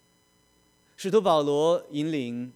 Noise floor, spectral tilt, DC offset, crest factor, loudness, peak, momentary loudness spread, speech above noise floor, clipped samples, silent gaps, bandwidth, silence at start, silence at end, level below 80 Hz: -65 dBFS; -6 dB/octave; under 0.1%; 18 dB; -25 LUFS; -8 dBFS; 9 LU; 40 dB; under 0.1%; none; 14 kHz; 1 s; 0.05 s; -70 dBFS